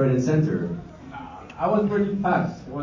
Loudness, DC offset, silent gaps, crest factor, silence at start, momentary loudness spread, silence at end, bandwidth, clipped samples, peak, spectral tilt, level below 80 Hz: -23 LUFS; under 0.1%; none; 14 dB; 0 s; 18 LU; 0 s; 7.4 kHz; under 0.1%; -10 dBFS; -8.5 dB/octave; -50 dBFS